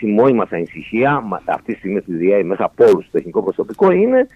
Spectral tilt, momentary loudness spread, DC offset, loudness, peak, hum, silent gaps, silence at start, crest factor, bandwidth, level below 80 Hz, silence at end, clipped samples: -8.5 dB/octave; 10 LU; under 0.1%; -16 LUFS; 0 dBFS; none; none; 0 s; 14 dB; 9.2 kHz; -54 dBFS; 0.1 s; under 0.1%